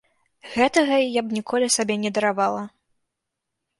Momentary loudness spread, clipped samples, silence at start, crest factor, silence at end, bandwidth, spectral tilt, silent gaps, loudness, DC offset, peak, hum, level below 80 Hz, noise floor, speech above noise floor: 9 LU; under 0.1%; 0.45 s; 18 dB; 1.1 s; 11.5 kHz; -3 dB/octave; none; -22 LUFS; under 0.1%; -4 dBFS; none; -64 dBFS; -82 dBFS; 60 dB